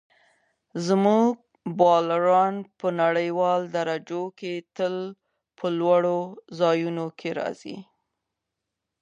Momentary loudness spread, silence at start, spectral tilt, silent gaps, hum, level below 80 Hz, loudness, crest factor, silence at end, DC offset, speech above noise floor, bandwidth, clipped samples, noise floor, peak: 15 LU; 0.75 s; -6.5 dB/octave; none; none; -78 dBFS; -24 LUFS; 20 dB; 1.2 s; under 0.1%; 60 dB; 9.8 kHz; under 0.1%; -84 dBFS; -6 dBFS